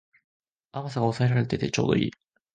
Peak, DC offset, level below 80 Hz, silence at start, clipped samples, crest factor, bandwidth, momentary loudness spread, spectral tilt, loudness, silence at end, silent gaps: -8 dBFS; under 0.1%; -56 dBFS; 0.75 s; under 0.1%; 20 dB; 9 kHz; 10 LU; -6.5 dB/octave; -26 LUFS; 0.45 s; none